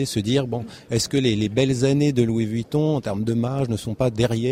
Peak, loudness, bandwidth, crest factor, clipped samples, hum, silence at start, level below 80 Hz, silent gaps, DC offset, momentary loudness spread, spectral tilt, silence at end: -6 dBFS; -22 LUFS; 16 kHz; 14 dB; under 0.1%; none; 0 s; -48 dBFS; none; under 0.1%; 6 LU; -6 dB/octave; 0 s